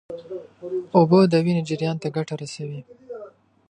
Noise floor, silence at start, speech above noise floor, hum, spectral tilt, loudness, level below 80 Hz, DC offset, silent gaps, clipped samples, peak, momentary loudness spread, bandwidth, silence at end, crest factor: -45 dBFS; 0.1 s; 23 dB; none; -7.5 dB/octave; -21 LUFS; -66 dBFS; under 0.1%; none; under 0.1%; -2 dBFS; 22 LU; 9.8 kHz; 0.4 s; 20 dB